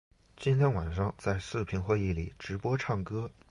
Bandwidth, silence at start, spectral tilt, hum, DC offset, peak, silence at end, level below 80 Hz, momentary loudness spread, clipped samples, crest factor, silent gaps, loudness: 11 kHz; 0.4 s; -7.5 dB/octave; none; under 0.1%; -16 dBFS; 0.2 s; -46 dBFS; 9 LU; under 0.1%; 16 dB; none; -32 LUFS